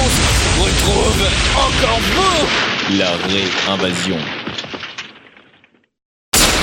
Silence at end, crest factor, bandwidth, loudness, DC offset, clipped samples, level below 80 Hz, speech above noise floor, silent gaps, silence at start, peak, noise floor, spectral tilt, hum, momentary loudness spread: 0 s; 14 dB; 17.5 kHz; -15 LUFS; under 0.1%; under 0.1%; -24 dBFS; 37 dB; 6.05-6.32 s; 0 s; -2 dBFS; -53 dBFS; -3 dB/octave; none; 12 LU